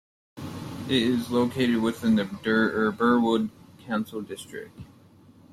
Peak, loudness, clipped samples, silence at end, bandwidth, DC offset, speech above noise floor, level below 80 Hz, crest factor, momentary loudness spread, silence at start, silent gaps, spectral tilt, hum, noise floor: -8 dBFS; -25 LUFS; under 0.1%; 0.65 s; 14 kHz; under 0.1%; 29 dB; -62 dBFS; 18 dB; 16 LU; 0.35 s; none; -6 dB/octave; none; -53 dBFS